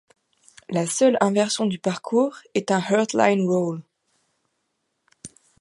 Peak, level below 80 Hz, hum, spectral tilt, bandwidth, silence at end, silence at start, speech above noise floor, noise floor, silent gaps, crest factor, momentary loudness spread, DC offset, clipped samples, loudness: -2 dBFS; -70 dBFS; none; -5 dB/octave; 11.5 kHz; 0.35 s; 0.7 s; 54 dB; -75 dBFS; none; 20 dB; 9 LU; under 0.1%; under 0.1%; -22 LUFS